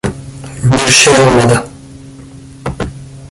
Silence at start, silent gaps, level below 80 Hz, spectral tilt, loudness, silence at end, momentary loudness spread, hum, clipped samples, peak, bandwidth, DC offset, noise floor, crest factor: 0.05 s; none; -34 dBFS; -3.5 dB/octave; -9 LUFS; 0.05 s; 22 LU; none; 0.1%; 0 dBFS; 16 kHz; under 0.1%; -33 dBFS; 12 dB